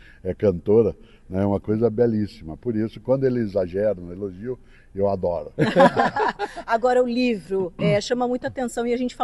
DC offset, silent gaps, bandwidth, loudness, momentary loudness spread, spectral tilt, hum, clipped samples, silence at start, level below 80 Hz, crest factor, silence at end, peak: under 0.1%; none; 12 kHz; -22 LUFS; 12 LU; -6.5 dB/octave; none; under 0.1%; 0.25 s; -48 dBFS; 20 dB; 0 s; -2 dBFS